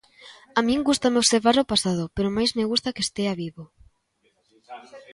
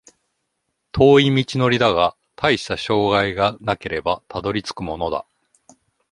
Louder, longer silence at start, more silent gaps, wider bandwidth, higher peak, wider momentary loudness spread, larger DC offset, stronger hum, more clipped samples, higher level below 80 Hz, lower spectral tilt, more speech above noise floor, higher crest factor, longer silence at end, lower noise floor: second, -22 LUFS vs -19 LUFS; second, 0.25 s vs 0.95 s; neither; about the same, 11.5 kHz vs 11.5 kHz; about the same, -4 dBFS vs -2 dBFS; first, 15 LU vs 12 LU; neither; neither; neither; second, -52 dBFS vs -46 dBFS; second, -3.5 dB/octave vs -6 dB/octave; second, 46 dB vs 56 dB; about the same, 20 dB vs 18 dB; second, 0 s vs 0.9 s; second, -68 dBFS vs -74 dBFS